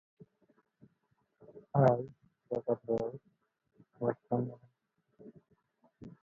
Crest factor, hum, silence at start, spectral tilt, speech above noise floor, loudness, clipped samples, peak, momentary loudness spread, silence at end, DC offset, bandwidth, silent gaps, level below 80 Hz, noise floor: 24 dB; none; 1.55 s; -9.5 dB/octave; 47 dB; -34 LUFS; under 0.1%; -12 dBFS; 22 LU; 0.1 s; under 0.1%; 6.6 kHz; none; -72 dBFS; -79 dBFS